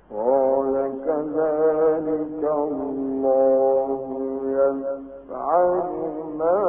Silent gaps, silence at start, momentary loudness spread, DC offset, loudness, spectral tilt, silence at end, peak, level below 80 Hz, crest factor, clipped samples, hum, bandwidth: none; 0.1 s; 9 LU; under 0.1%; -22 LUFS; -12 dB/octave; 0 s; -8 dBFS; -56 dBFS; 14 dB; under 0.1%; none; 2.6 kHz